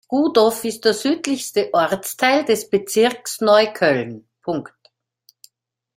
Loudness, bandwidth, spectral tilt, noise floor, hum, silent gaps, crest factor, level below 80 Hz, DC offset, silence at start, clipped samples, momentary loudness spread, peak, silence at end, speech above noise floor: -18 LUFS; 16.5 kHz; -3.5 dB/octave; -65 dBFS; none; none; 18 dB; -64 dBFS; under 0.1%; 0.1 s; under 0.1%; 11 LU; 0 dBFS; 1.35 s; 47 dB